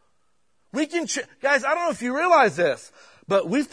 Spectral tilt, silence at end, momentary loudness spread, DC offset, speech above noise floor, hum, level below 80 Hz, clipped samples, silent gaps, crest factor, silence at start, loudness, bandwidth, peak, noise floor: -3.5 dB/octave; 0.05 s; 11 LU; under 0.1%; 50 dB; none; -72 dBFS; under 0.1%; none; 18 dB; 0.75 s; -22 LUFS; 11 kHz; -6 dBFS; -72 dBFS